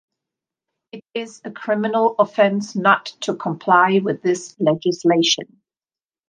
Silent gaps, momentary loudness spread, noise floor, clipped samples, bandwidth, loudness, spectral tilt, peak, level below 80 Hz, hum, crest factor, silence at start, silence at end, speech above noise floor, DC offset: none; 14 LU; under -90 dBFS; under 0.1%; 10 kHz; -18 LUFS; -4.5 dB/octave; -2 dBFS; -72 dBFS; none; 18 dB; 0.95 s; 0.85 s; over 71 dB; under 0.1%